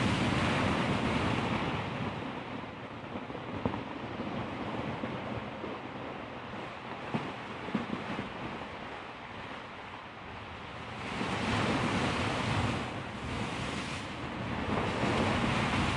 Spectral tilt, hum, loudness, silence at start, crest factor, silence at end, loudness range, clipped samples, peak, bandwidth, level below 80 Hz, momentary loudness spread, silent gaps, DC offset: -5.5 dB/octave; none; -35 LUFS; 0 s; 20 dB; 0 s; 6 LU; under 0.1%; -14 dBFS; 11.5 kHz; -52 dBFS; 13 LU; none; under 0.1%